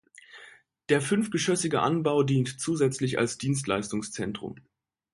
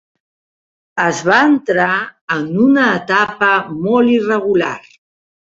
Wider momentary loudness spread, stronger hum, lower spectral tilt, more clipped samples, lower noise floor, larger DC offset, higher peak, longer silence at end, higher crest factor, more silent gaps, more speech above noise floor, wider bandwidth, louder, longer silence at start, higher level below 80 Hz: first, 13 LU vs 9 LU; neither; about the same, -5 dB/octave vs -5.5 dB/octave; neither; second, -54 dBFS vs under -90 dBFS; neither; second, -10 dBFS vs 0 dBFS; about the same, 0.6 s vs 0.7 s; about the same, 18 dB vs 14 dB; second, none vs 2.21-2.28 s; second, 27 dB vs over 76 dB; first, 11.5 kHz vs 7.8 kHz; second, -27 LUFS vs -14 LUFS; second, 0.35 s vs 0.95 s; about the same, -62 dBFS vs -58 dBFS